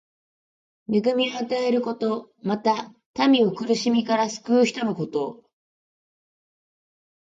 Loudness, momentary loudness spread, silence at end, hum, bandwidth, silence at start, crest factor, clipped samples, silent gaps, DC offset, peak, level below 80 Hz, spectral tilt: -23 LUFS; 9 LU; 1.85 s; none; 7.8 kHz; 0.9 s; 18 dB; under 0.1%; 3.06-3.14 s; under 0.1%; -6 dBFS; -72 dBFS; -5 dB/octave